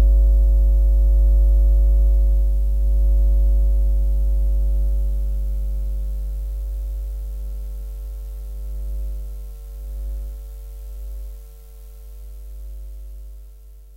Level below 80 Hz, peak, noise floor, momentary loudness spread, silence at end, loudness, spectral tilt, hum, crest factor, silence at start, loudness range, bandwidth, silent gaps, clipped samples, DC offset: -18 dBFS; -8 dBFS; -41 dBFS; 21 LU; 0 s; -22 LUFS; -9 dB/octave; none; 10 dB; 0 s; 17 LU; 0.9 kHz; none; under 0.1%; under 0.1%